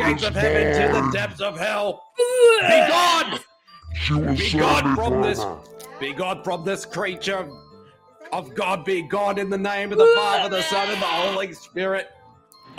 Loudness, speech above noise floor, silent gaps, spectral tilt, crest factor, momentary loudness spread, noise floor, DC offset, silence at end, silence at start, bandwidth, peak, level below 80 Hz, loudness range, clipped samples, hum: -21 LUFS; 30 dB; none; -4.5 dB/octave; 18 dB; 15 LU; -51 dBFS; under 0.1%; 0.05 s; 0 s; 16 kHz; -4 dBFS; -42 dBFS; 8 LU; under 0.1%; none